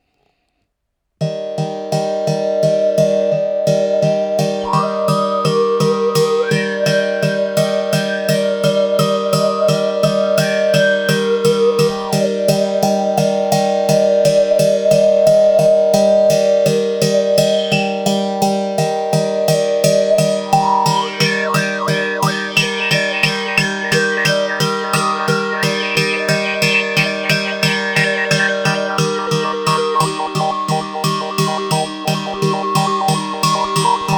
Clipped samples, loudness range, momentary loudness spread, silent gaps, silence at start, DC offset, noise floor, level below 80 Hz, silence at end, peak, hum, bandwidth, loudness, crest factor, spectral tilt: under 0.1%; 4 LU; 5 LU; none; 1.2 s; under 0.1%; -72 dBFS; -54 dBFS; 0 s; 0 dBFS; none; over 20 kHz; -15 LUFS; 16 dB; -4.5 dB/octave